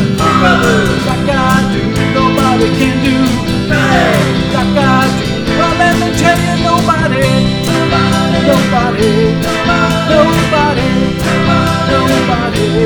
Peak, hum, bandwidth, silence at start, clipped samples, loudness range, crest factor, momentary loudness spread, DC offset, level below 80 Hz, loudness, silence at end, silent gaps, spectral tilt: 0 dBFS; none; over 20 kHz; 0 s; 0.1%; 1 LU; 10 dB; 3 LU; 0.6%; -28 dBFS; -11 LUFS; 0 s; none; -5.5 dB/octave